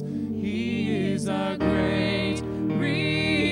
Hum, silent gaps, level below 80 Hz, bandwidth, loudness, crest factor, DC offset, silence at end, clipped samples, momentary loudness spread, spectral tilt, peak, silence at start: none; none; -48 dBFS; 11.5 kHz; -25 LUFS; 14 dB; under 0.1%; 0 s; under 0.1%; 5 LU; -6 dB/octave; -12 dBFS; 0 s